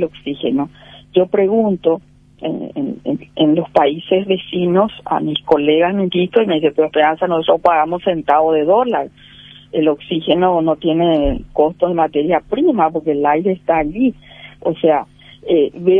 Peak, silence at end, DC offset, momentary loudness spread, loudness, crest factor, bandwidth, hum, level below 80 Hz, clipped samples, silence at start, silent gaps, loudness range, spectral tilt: 0 dBFS; 0 s; under 0.1%; 9 LU; -16 LUFS; 16 dB; 4.7 kHz; none; -40 dBFS; under 0.1%; 0 s; none; 3 LU; -8.5 dB/octave